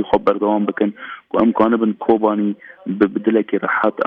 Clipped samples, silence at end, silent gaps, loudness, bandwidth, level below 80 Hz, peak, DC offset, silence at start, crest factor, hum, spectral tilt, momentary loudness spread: under 0.1%; 0 s; none; -18 LUFS; 4.9 kHz; -54 dBFS; -2 dBFS; under 0.1%; 0 s; 16 dB; none; -9 dB/octave; 7 LU